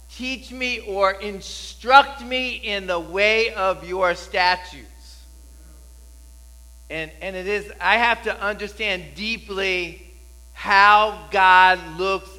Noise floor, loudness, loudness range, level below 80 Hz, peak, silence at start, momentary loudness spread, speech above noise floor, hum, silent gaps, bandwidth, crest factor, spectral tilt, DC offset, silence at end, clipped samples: -44 dBFS; -20 LUFS; 9 LU; -44 dBFS; 0 dBFS; 0.1 s; 16 LU; 24 dB; none; none; 16 kHz; 22 dB; -3 dB/octave; under 0.1%; 0 s; under 0.1%